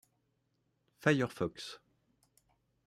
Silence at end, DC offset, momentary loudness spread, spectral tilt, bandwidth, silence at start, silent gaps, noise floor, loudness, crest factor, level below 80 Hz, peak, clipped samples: 1.1 s; under 0.1%; 16 LU; -6 dB/octave; 15 kHz; 1 s; none; -79 dBFS; -34 LUFS; 26 dB; -72 dBFS; -14 dBFS; under 0.1%